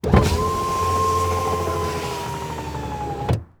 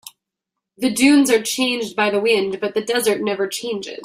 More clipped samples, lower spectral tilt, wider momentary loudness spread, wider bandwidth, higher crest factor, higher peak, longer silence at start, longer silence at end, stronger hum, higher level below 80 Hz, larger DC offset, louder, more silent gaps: neither; first, -5.5 dB/octave vs -3 dB/octave; about the same, 10 LU vs 9 LU; first, over 20 kHz vs 16 kHz; about the same, 20 dB vs 16 dB; about the same, 0 dBFS vs -2 dBFS; about the same, 0.05 s vs 0.05 s; first, 0.15 s vs 0 s; neither; first, -32 dBFS vs -62 dBFS; neither; second, -23 LUFS vs -18 LUFS; neither